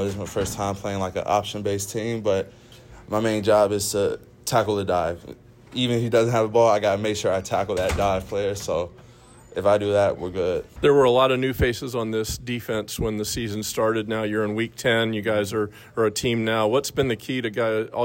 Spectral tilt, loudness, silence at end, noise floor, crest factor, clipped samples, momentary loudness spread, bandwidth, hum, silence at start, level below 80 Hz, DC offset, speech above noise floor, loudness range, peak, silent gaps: -5 dB/octave; -23 LUFS; 0 s; -48 dBFS; 16 dB; under 0.1%; 8 LU; 16.5 kHz; none; 0 s; -46 dBFS; under 0.1%; 25 dB; 3 LU; -8 dBFS; none